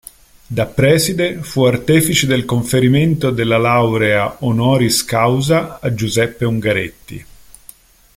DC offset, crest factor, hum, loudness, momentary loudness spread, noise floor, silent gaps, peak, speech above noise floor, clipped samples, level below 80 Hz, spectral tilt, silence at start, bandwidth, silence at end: under 0.1%; 14 dB; none; -15 LUFS; 8 LU; -44 dBFS; none; 0 dBFS; 29 dB; under 0.1%; -42 dBFS; -5 dB/octave; 0.5 s; 16.5 kHz; 0.95 s